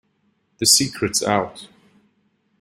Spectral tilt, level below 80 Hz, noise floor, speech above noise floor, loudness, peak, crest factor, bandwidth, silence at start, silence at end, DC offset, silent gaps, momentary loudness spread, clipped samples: -2 dB/octave; -58 dBFS; -66 dBFS; 47 dB; -17 LUFS; 0 dBFS; 22 dB; 16 kHz; 0.6 s; 0.95 s; under 0.1%; none; 8 LU; under 0.1%